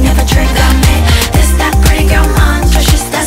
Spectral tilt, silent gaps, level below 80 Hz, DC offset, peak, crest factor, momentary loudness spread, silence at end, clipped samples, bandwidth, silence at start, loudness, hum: -4.5 dB/octave; none; -10 dBFS; under 0.1%; 0 dBFS; 8 dB; 1 LU; 0 s; 0.2%; 16.5 kHz; 0 s; -9 LUFS; none